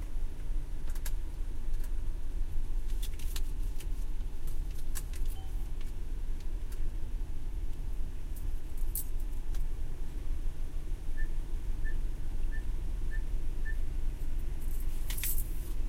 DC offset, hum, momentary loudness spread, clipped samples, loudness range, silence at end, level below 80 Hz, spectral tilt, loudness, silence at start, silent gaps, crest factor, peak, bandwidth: under 0.1%; none; 5 LU; under 0.1%; 2 LU; 0 s; -32 dBFS; -4.5 dB/octave; -41 LUFS; 0 s; none; 12 dB; -18 dBFS; 16 kHz